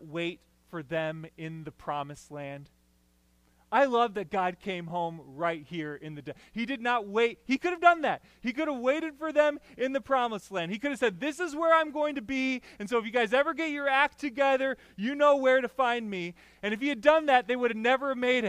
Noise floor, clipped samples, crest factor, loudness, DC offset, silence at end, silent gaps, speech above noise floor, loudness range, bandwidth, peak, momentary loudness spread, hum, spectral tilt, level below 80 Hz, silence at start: -67 dBFS; under 0.1%; 22 dB; -28 LUFS; under 0.1%; 0 s; none; 38 dB; 6 LU; 14.5 kHz; -8 dBFS; 16 LU; none; -5 dB/octave; -66 dBFS; 0 s